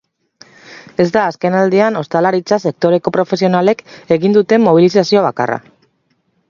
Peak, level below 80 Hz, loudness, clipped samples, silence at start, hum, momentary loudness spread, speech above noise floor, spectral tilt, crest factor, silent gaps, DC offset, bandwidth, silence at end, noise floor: 0 dBFS; -58 dBFS; -13 LUFS; under 0.1%; 0.7 s; none; 7 LU; 49 dB; -6.5 dB/octave; 14 dB; none; under 0.1%; 7.4 kHz; 0.9 s; -62 dBFS